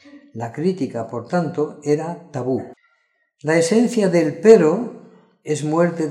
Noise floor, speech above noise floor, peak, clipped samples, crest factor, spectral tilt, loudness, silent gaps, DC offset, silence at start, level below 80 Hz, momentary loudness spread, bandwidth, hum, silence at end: -66 dBFS; 48 dB; 0 dBFS; under 0.1%; 20 dB; -6.5 dB/octave; -19 LUFS; none; under 0.1%; 0.15 s; -68 dBFS; 18 LU; 11.5 kHz; none; 0 s